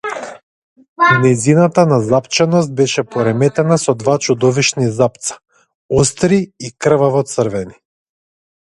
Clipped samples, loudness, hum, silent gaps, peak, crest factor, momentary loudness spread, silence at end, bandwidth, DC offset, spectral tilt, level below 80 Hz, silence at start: under 0.1%; -14 LUFS; none; 0.43-0.76 s, 0.88-0.96 s, 5.75-5.89 s; 0 dBFS; 14 dB; 13 LU; 0.95 s; 11.5 kHz; under 0.1%; -5 dB/octave; -46 dBFS; 0.05 s